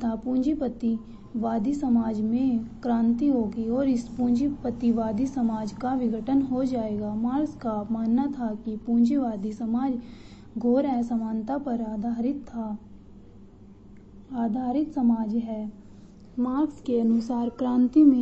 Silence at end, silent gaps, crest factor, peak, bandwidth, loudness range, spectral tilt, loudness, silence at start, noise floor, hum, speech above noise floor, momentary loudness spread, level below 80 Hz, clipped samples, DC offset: 0 s; none; 18 dB; -8 dBFS; 8 kHz; 5 LU; -8 dB/octave; -26 LUFS; 0 s; -48 dBFS; none; 23 dB; 9 LU; -52 dBFS; under 0.1%; under 0.1%